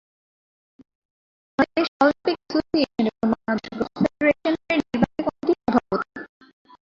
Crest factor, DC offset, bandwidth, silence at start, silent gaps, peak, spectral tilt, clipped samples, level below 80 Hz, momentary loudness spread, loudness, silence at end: 20 dB; under 0.1%; 7.6 kHz; 1.6 s; 1.88-2.00 s; -4 dBFS; -6.5 dB/octave; under 0.1%; -56 dBFS; 8 LU; -23 LUFS; 0.6 s